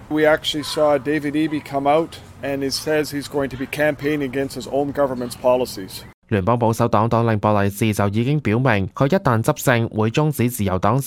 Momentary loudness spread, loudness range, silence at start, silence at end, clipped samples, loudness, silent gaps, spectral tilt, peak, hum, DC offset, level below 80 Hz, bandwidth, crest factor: 7 LU; 4 LU; 0 s; 0 s; under 0.1%; -20 LUFS; 6.14-6.22 s; -6 dB/octave; -2 dBFS; none; under 0.1%; -48 dBFS; 17 kHz; 16 dB